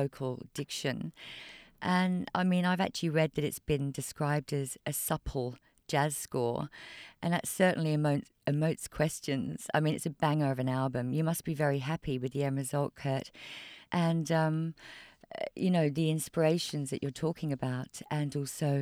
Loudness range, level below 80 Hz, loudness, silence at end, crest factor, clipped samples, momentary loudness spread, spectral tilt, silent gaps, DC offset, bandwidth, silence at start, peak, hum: 2 LU; -58 dBFS; -32 LUFS; 0 s; 18 dB; under 0.1%; 11 LU; -5.5 dB/octave; none; under 0.1%; 16 kHz; 0 s; -14 dBFS; none